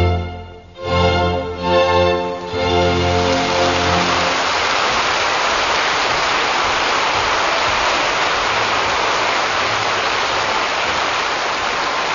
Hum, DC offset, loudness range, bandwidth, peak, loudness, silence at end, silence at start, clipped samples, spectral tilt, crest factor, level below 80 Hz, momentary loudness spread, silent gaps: none; 0.1%; 1 LU; 7.4 kHz; -2 dBFS; -16 LUFS; 0 s; 0 s; under 0.1%; -3.5 dB/octave; 16 dB; -38 dBFS; 3 LU; none